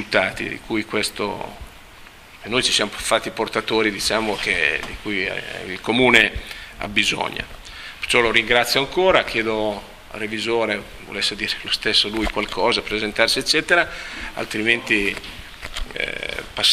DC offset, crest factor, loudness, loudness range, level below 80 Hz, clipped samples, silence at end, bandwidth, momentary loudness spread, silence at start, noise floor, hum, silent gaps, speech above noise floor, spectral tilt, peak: under 0.1%; 22 dB; -20 LUFS; 3 LU; -42 dBFS; under 0.1%; 0 s; 15.5 kHz; 15 LU; 0 s; -43 dBFS; none; none; 22 dB; -2.5 dB/octave; 0 dBFS